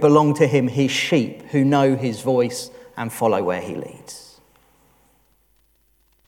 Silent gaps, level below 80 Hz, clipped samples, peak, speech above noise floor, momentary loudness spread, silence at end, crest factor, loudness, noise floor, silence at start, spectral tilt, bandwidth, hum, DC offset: none; -64 dBFS; under 0.1%; -2 dBFS; 43 dB; 18 LU; 2.05 s; 18 dB; -20 LUFS; -62 dBFS; 0 s; -6 dB/octave; 16.5 kHz; none; under 0.1%